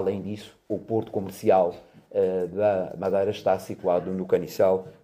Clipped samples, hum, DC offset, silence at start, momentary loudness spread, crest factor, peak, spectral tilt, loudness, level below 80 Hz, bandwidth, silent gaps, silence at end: under 0.1%; none; under 0.1%; 0 s; 10 LU; 18 dB; -8 dBFS; -7 dB/octave; -26 LUFS; -64 dBFS; 16 kHz; none; 0.1 s